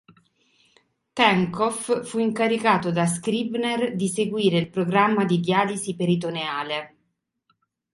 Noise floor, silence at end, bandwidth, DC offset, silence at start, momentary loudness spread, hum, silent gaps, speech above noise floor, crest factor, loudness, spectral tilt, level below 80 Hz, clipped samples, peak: -74 dBFS; 1.05 s; 11.5 kHz; under 0.1%; 1.15 s; 7 LU; none; none; 52 dB; 20 dB; -23 LUFS; -5 dB/octave; -64 dBFS; under 0.1%; -4 dBFS